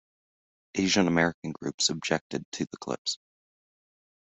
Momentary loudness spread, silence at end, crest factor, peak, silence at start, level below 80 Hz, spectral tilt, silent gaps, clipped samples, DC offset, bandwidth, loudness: 12 LU; 1.05 s; 24 dB; -8 dBFS; 0.75 s; -66 dBFS; -3.5 dB/octave; 1.34-1.42 s, 1.74-1.78 s, 2.21-2.30 s, 2.45-2.52 s, 2.98-3.05 s; under 0.1%; under 0.1%; 8.2 kHz; -28 LUFS